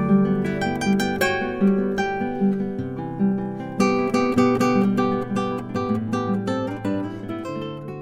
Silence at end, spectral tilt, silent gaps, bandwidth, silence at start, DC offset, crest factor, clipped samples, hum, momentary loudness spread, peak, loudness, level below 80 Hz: 0 s; -6.5 dB/octave; none; 15.5 kHz; 0 s; under 0.1%; 16 dB; under 0.1%; none; 10 LU; -6 dBFS; -23 LUFS; -50 dBFS